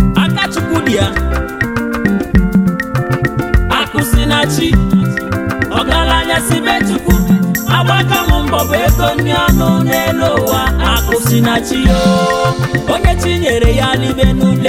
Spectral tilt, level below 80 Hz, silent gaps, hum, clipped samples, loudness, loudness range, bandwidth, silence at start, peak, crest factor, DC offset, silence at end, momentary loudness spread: -5.5 dB/octave; -20 dBFS; none; none; under 0.1%; -12 LUFS; 2 LU; 17 kHz; 0 s; 0 dBFS; 12 dB; under 0.1%; 0 s; 4 LU